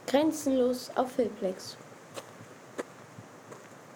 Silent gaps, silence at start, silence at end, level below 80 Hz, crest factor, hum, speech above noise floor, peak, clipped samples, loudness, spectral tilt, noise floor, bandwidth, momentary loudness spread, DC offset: none; 0 s; 0 s; -70 dBFS; 20 dB; none; 21 dB; -12 dBFS; under 0.1%; -31 LUFS; -4.5 dB/octave; -50 dBFS; 19.5 kHz; 21 LU; under 0.1%